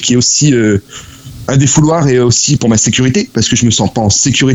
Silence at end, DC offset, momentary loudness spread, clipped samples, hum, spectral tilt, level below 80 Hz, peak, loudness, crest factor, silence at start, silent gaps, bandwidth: 0 s; under 0.1%; 6 LU; under 0.1%; none; -4 dB/octave; -36 dBFS; 0 dBFS; -9 LUFS; 10 dB; 0 s; none; 9.4 kHz